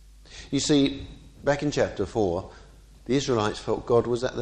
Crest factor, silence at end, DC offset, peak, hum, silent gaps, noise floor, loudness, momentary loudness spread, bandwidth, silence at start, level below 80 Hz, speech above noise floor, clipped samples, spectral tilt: 18 dB; 0 s; under 0.1%; -10 dBFS; none; none; -46 dBFS; -26 LUFS; 22 LU; 9.8 kHz; 0.3 s; -48 dBFS; 21 dB; under 0.1%; -5 dB/octave